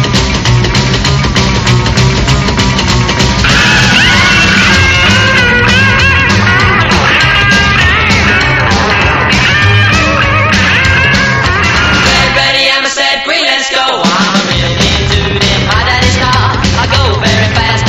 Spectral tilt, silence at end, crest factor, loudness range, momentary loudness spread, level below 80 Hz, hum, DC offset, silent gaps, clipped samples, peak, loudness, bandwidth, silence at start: -4 dB/octave; 0 s; 8 dB; 3 LU; 4 LU; -20 dBFS; none; 0.3%; none; 0.4%; 0 dBFS; -7 LUFS; 13.5 kHz; 0 s